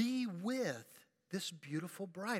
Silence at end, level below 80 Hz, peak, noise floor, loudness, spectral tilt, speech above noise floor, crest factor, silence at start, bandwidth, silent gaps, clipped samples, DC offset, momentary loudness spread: 0 s; under -90 dBFS; -24 dBFS; -65 dBFS; -41 LUFS; -4.5 dB/octave; 23 dB; 16 dB; 0 s; 16.5 kHz; none; under 0.1%; under 0.1%; 9 LU